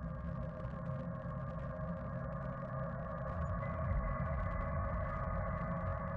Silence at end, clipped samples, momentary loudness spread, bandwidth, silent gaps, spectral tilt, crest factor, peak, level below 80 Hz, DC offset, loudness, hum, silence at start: 0 s; under 0.1%; 5 LU; 5 kHz; none; -10.5 dB/octave; 14 dB; -26 dBFS; -46 dBFS; under 0.1%; -41 LUFS; none; 0 s